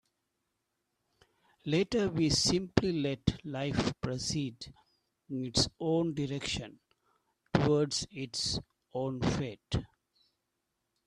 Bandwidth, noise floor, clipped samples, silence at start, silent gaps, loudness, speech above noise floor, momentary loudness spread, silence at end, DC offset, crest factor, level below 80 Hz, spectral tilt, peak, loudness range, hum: 13 kHz; -83 dBFS; under 0.1%; 1.65 s; none; -32 LUFS; 51 dB; 11 LU; 1.2 s; under 0.1%; 28 dB; -52 dBFS; -4.5 dB/octave; -6 dBFS; 3 LU; none